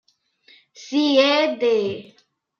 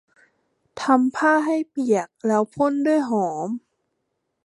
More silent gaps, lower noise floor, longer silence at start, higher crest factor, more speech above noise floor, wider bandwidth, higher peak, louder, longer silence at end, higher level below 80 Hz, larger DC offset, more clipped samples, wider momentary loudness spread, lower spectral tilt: neither; second, -57 dBFS vs -76 dBFS; about the same, 0.8 s vs 0.75 s; about the same, 18 dB vs 20 dB; second, 38 dB vs 55 dB; second, 7.2 kHz vs 11.5 kHz; about the same, -4 dBFS vs -4 dBFS; about the same, -19 LUFS vs -21 LUFS; second, 0.55 s vs 0.85 s; second, -78 dBFS vs -70 dBFS; neither; neither; about the same, 11 LU vs 10 LU; second, -4 dB/octave vs -5.5 dB/octave